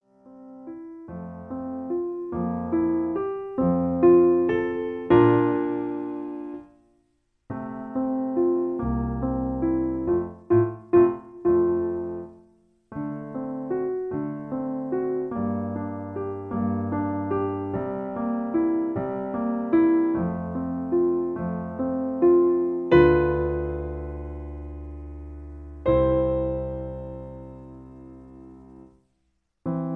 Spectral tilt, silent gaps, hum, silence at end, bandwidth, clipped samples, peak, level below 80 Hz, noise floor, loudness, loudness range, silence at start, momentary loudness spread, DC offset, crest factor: -11 dB/octave; none; none; 0 s; 4.3 kHz; under 0.1%; -4 dBFS; -42 dBFS; -73 dBFS; -25 LUFS; 8 LU; 0.25 s; 19 LU; under 0.1%; 20 dB